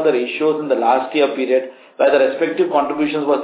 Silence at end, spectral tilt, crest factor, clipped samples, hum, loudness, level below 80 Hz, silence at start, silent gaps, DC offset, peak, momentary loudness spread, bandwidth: 0 s; -9 dB/octave; 14 dB; under 0.1%; none; -17 LUFS; -82 dBFS; 0 s; none; under 0.1%; -2 dBFS; 4 LU; 4 kHz